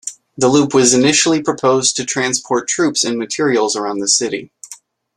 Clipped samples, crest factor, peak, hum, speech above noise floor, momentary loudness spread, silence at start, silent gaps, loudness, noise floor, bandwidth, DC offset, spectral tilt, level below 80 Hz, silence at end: under 0.1%; 16 dB; 0 dBFS; none; 26 dB; 13 LU; 0.05 s; none; -14 LUFS; -41 dBFS; 13 kHz; under 0.1%; -3 dB/octave; -58 dBFS; 0.4 s